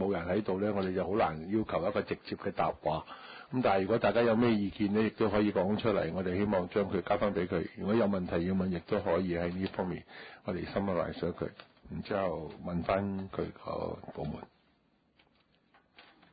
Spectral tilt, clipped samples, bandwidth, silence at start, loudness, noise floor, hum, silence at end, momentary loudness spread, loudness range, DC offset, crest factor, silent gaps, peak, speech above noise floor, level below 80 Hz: -6 dB/octave; under 0.1%; 4.9 kHz; 0 s; -32 LUFS; -71 dBFS; none; 0.3 s; 11 LU; 7 LU; under 0.1%; 16 dB; none; -16 dBFS; 39 dB; -54 dBFS